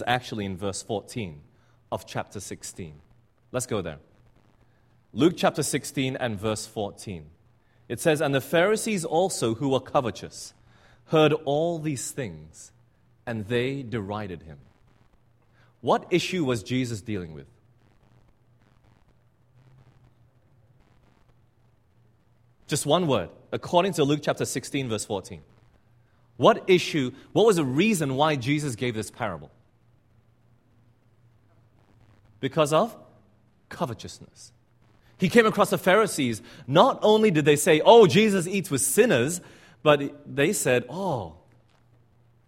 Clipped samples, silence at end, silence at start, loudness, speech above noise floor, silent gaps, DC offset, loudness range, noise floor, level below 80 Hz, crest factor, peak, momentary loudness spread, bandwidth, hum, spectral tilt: under 0.1%; 1.15 s; 0 s; -24 LUFS; 39 dB; none; under 0.1%; 15 LU; -63 dBFS; -60 dBFS; 24 dB; -2 dBFS; 18 LU; 16 kHz; none; -4.5 dB/octave